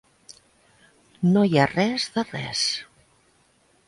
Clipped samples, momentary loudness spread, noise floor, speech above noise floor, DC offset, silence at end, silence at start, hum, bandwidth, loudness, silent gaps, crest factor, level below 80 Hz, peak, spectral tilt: under 0.1%; 9 LU; -62 dBFS; 40 dB; under 0.1%; 1.05 s; 1.2 s; none; 11.5 kHz; -23 LUFS; none; 18 dB; -60 dBFS; -6 dBFS; -5 dB/octave